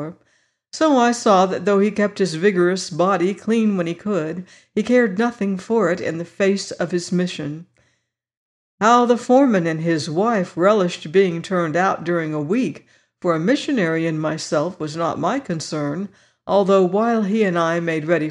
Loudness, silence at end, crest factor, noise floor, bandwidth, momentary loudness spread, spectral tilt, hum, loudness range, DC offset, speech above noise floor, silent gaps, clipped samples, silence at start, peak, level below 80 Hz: -19 LUFS; 0 s; 16 dB; -69 dBFS; 11 kHz; 10 LU; -6 dB/octave; none; 4 LU; under 0.1%; 50 dB; 8.37-8.78 s; under 0.1%; 0 s; -4 dBFS; -66 dBFS